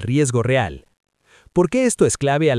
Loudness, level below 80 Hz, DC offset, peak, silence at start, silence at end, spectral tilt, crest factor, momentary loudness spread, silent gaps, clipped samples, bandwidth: -19 LUFS; -46 dBFS; under 0.1%; -2 dBFS; 0 s; 0 s; -5.5 dB/octave; 16 dB; 5 LU; none; under 0.1%; 12 kHz